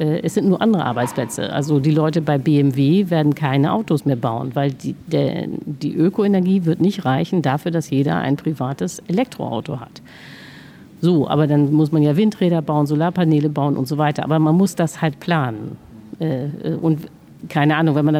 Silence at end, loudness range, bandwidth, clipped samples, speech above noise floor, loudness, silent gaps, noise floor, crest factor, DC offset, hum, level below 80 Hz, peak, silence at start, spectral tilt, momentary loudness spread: 0 s; 4 LU; 15 kHz; under 0.1%; 23 dB; -19 LUFS; none; -41 dBFS; 16 dB; under 0.1%; none; -58 dBFS; -2 dBFS; 0 s; -7.5 dB/octave; 10 LU